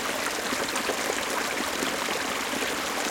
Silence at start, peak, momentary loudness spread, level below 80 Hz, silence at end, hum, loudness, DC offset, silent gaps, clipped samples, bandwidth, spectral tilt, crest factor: 0 s; -10 dBFS; 1 LU; -58 dBFS; 0 s; none; -27 LUFS; under 0.1%; none; under 0.1%; 17 kHz; -1.5 dB/octave; 18 dB